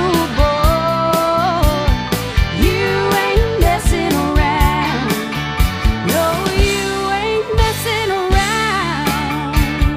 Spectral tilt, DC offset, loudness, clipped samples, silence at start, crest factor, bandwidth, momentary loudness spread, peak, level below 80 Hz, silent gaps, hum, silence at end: -5 dB/octave; under 0.1%; -16 LUFS; under 0.1%; 0 s; 14 dB; 15.5 kHz; 4 LU; 0 dBFS; -20 dBFS; none; none; 0 s